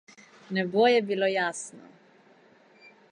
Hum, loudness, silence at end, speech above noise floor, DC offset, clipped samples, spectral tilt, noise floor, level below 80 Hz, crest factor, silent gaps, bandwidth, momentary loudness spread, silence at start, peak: none; -25 LUFS; 1.35 s; 33 dB; under 0.1%; under 0.1%; -4 dB/octave; -58 dBFS; -84 dBFS; 18 dB; none; 11 kHz; 14 LU; 0.5 s; -10 dBFS